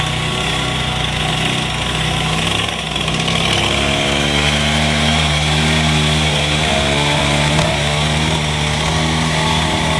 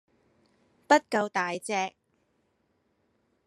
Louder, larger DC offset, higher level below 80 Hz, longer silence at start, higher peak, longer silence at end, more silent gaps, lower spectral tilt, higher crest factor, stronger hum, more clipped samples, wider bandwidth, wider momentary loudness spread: first, -15 LUFS vs -27 LUFS; neither; first, -28 dBFS vs -84 dBFS; second, 0 s vs 0.9 s; first, 0 dBFS vs -8 dBFS; second, 0 s vs 1.55 s; neither; about the same, -4 dB/octave vs -3.5 dB/octave; second, 16 dB vs 24 dB; neither; neither; about the same, 12 kHz vs 13 kHz; second, 4 LU vs 8 LU